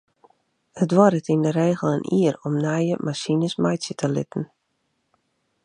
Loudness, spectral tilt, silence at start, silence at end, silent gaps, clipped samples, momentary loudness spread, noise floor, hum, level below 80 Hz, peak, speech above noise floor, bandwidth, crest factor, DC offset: -22 LUFS; -6.5 dB/octave; 0.75 s; 1.2 s; none; under 0.1%; 9 LU; -73 dBFS; none; -68 dBFS; -2 dBFS; 51 dB; 10.5 kHz; 20 dB; under 0.1%